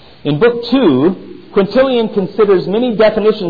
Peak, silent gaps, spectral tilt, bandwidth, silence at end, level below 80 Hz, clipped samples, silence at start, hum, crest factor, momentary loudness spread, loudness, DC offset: -2 dBFS; none; -9 dB/octave; 5 kHz; 0 s; -44 dBFS; under 0.1%; 0.25 s; none; 10 dB; 6 LU; -12 LUFS; 1%